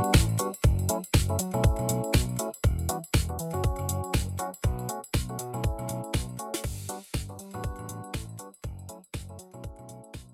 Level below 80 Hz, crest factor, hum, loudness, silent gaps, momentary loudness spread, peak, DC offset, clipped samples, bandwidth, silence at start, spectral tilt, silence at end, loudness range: -34 dBFS; 24 dB; none; -29 LUFS; none; 15 LU; -6 dBFS; under 0.1%; under 0.1%; 16.5 kHz; 0 s; -5 dB/octave; 0 s; 11 LU